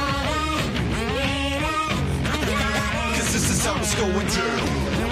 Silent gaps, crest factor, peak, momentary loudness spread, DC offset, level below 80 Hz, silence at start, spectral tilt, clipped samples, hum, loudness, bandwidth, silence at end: none; 14 dB; -10 dBFS; 3 LU; under 0.1%; -32 dBFS; 0 s; -4 dB/octave; under 0.1%; none; -23 LUFS; 15.5 kHz; 0 s